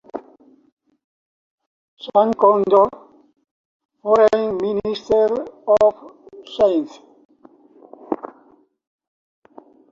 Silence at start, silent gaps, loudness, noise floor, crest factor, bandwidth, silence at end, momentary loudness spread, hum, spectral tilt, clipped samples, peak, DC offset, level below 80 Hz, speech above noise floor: 0.15 s; 0.72-0.77 s, 1.04-1.58 s, 1.66-1.97 s, 3.51-3.89 s, 7.25-7.29 s; -18 LUFS; -54 dBFS; 20 dB; 7.4 kHz; 1.65 s; 19 LU; none; -6.5 dB/octave; under 0.1%; -2 dBFS; under 0.1%; -58 dBFS; 38 dB